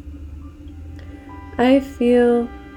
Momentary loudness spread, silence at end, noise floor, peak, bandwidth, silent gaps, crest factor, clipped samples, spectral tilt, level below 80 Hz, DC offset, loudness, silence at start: 22 LU; 0 s; -36 dBFS; -4 dBFS; 12 kHz; none; 16 dB; under 0.1%; -7 dB/octave; -40 dBFS; under 0.1%; -17 LUFS; 0.05 s